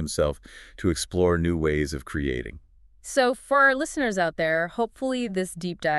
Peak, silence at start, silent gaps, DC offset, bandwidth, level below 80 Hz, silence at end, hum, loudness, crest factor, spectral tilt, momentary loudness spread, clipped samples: -8 dBFS; 0 s; none; under 0.1%; 12 kHz; -42 dBFS; 0 s; none; -25 LUFS; 18 dB; -5 dB/octave; 11 LU; under 0.1%